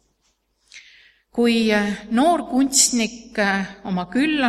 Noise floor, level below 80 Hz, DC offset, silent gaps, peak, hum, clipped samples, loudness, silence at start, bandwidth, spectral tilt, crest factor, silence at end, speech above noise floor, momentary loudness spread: -68 dBFS; -54 dBFS; under 0.1%; none; -2 dBFS; none; under 0.1%; -19 LUFS; 0.75 s; 15.5 kHz; -3 dB/octave; 20 dB; 0 s; 48 dB; 10 LU